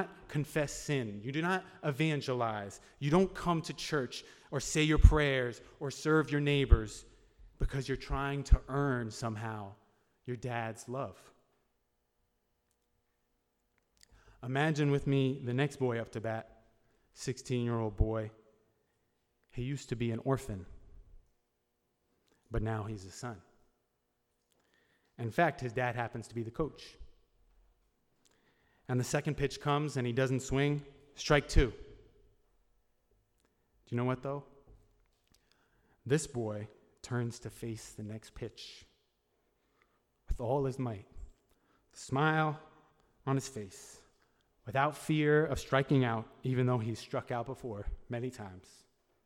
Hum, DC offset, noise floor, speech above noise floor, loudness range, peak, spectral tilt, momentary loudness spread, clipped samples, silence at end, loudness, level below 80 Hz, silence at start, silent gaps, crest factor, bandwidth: none; under 0.1%; -80 dBFS; 47 dB; 13 LU; -6 dBFS; -6 dB/octave; 16 LU; under 0.1%; 0.65 s; -34 LUFS; -42 dBFS; 0 s; none; 28 dB; 15.5 kHz